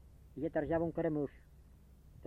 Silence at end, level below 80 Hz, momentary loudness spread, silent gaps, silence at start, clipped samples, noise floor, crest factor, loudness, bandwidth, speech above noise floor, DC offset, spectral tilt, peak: 0 s; -58 dBFS; 9 LU; none; 0.05 s; under 0.1%; -60 dBFS; 18 dB; -37 LUFS; 4.2 kHz; 23 dB; under 0.1%; -9.5 dB/octave; -22 dBFS